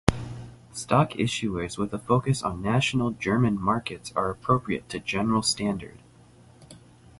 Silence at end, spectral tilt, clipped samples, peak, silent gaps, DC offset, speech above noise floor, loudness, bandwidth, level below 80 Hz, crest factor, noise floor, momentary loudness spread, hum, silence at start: 0.4 s; -5.5 dB/octave; under 0.1%; 0 dBFS; none; under 0.1%; 27 dB; -26 LUFS; 11.5 kHz; -46 dBFS; 26 dB; -53 dBFS; 12 LU; none; 0.05 s